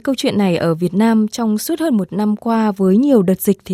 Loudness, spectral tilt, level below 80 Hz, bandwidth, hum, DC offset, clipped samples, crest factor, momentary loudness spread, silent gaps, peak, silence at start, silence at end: -16 LUFS; -6.5 dB/octave; -56 dBFS; 15.5 kHz; none; under 0.1%; under 0.1%; 14 dB; 5 LU; none; -2 dBFS; 0.05 s; 0 s